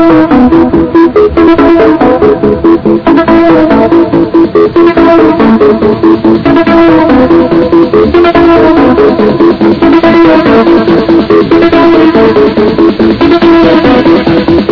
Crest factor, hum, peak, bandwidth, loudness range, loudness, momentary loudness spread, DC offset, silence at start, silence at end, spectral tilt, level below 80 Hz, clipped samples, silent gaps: 4 dB; none; 0 dBFS; 5.4 kHz; 1 LU; -4 LUFS; 3 LU; under 0.1%; 0 s; 0 s; -8.5 dB/octave; -26 dBFS; 30%; none